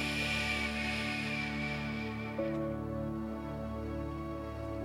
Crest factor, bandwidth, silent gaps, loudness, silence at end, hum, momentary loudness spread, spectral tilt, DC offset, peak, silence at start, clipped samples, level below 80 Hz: 14 dB; 16 kHz; none; -36 LUFS; 0 s; none; 8 LU; -5 dB/octave; under 0.1%; -22 dBFS; 0 s; under 0.1%; -50 dBFS